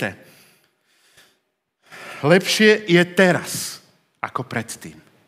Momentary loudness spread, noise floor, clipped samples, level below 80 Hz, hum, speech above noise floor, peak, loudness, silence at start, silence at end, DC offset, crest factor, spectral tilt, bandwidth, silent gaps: 22 LU; -71 dBFS; under 0.1%; -70 dBFS; none; 53 dB; 0 dBFS; -18 LUFS; 0 s; 0.35 s; under 0.1%; 22 dB; -4.5 dB/octave; 16 kHz; none